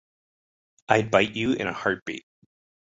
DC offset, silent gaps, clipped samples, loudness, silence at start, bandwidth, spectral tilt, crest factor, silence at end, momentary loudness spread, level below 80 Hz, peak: under 0.1%; 2.02-2.06 s; under 0.1%; -24 LUFS; 0.9 s; 8 kHz; -5 dB/octave; 24 dB; 0.7 s; 13 LU; -60 dBFS; -4 dBFS